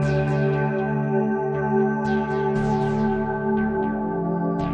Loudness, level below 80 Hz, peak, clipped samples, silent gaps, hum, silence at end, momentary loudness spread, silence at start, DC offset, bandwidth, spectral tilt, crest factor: -23 LUFS; -44 dBFS; -10 dBFS; under 0.1%; none; none; 0 s; 3 LU; 0 s; under 0.1%; 8.2 kHz; -9 dB/octave; 12 dB